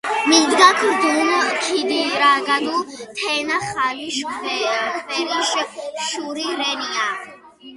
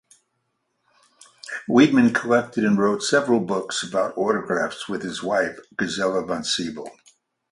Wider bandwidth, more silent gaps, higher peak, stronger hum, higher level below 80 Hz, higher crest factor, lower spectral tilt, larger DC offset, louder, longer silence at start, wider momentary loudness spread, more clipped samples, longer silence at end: about the same, 11.5 kHz vs 11.5 kHz; neither; first, 0 dBFS vs -4 dBFS; neither; about the same, -64 dBFS vs -62 dBFS; about the same, 20 dB vs 20 dB; second, -1 dB/octave vs -4.5 dB/octave; neither; first, -18 LUFS vs -22 LUFS; second, 0.05 s vs 1.45 s; about the same, 11 LU vs 13 LU; neither; second, 0 s vs 0.6 s